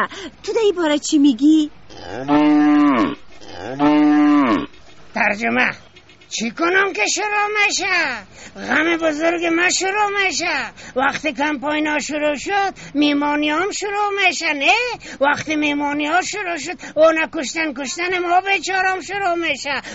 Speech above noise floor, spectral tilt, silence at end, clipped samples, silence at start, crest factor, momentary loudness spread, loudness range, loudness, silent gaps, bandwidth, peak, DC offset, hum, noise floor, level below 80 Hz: 26 dB; -1.5 dB/octave; 0 s; under 0.1%; 0 s; 16 dB; 10 LU; 3 LU; -18 LUFS; none; 8 kHz; -2 dBFS; 0.3%; none; -44 dBFS; -54 dBFS